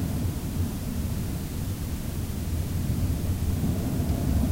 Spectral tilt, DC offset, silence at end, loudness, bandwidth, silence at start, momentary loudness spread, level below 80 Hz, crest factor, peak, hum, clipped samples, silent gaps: -6.5 dB/octave; under 0.1%; 0 s; -29 LUFS; 16 kHz; 0 s; 5 LU; -32 dBFS; 14 dB; -12 dBFS; none; under 0.1%; none